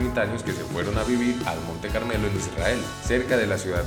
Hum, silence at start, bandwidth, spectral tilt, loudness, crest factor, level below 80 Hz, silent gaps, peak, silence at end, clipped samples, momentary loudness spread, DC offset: none; 0 s; 19.5 kHz; -5 dB/octave; -26 LUFS; 18 dB; -36 dBFS; none; -8 dBFS; 0 s; under 0.1%; 6 LU; under 0.1%